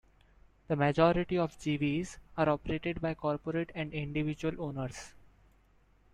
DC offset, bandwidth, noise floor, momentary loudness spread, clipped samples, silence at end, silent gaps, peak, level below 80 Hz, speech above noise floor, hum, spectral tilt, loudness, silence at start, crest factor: under 0.1%; 11 kHz; -65 dBFS; 11 LU; under 0.1%; 1.05 s; none; -12 dBFS; -54 dBFS; 33 dB; none; -7 dB/octave; -33 LUFS; 0.7 s; 22 dB